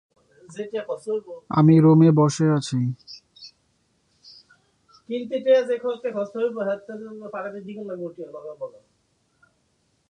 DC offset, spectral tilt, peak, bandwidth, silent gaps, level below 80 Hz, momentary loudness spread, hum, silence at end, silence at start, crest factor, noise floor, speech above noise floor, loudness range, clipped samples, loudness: under 0.1%; -7.5 dB/octave; -6 dBFS; 10 kHz; none; -66 dBFS; 22 LU; none; 1.4 s; 0.5 s; 18 dB; -68 dBFS; 46 dB; 12 LU; under 0.1%; -22 LUFS